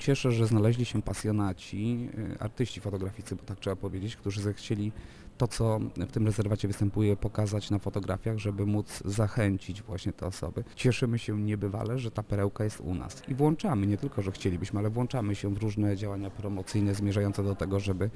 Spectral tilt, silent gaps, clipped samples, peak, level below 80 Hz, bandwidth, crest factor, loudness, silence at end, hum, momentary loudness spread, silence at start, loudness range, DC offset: -7 dB/octave; none; under 0.1%; -12 dBFS; -48 dBFS; 11 kHz; 18 dB; -31 LUFS; 0 s; none; 9 LU; 0 s; 4 LU; under 0.1%